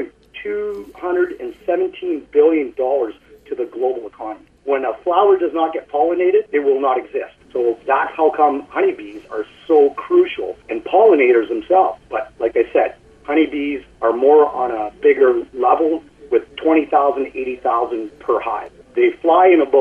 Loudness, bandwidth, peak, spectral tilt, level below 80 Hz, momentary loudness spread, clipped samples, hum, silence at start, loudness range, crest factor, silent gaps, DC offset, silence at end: -17 LUFS; 4.4 kHz; -2 dBFS; -6.5 dB/octave; -56 dBFS; 14 LU; under 0.1%; none; 0 s; 4 LU; 14 dB; none; under 0.1%; 0 s